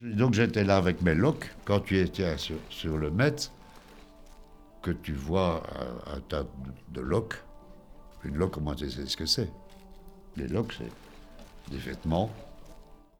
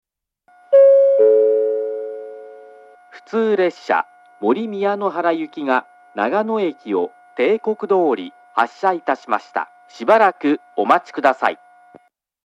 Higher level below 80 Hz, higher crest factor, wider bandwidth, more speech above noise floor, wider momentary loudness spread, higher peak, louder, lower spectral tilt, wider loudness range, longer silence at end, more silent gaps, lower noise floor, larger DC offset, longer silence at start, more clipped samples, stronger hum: first, -46 dBFS vs -82 dBFS; about the same, 20 dB vs 18 dB; first, 18 kHz vs 7.8 kHz; second, 22 dB vs 41 dB; about the same, 16 LU vs 14 LU; second, -10 dBFS vs 0 dBFS; second, -30 LUFS vs -18 LUFS; about the same, -6 dB/octave vs -6 dB/octave; about the same, 7 LU vs 5 LU; second, 0.25 s vs 0.9 s; neither; second, -51 dBFS vs -60 dBFS; neither; second, 0 s vs 0.7 s; neither; neither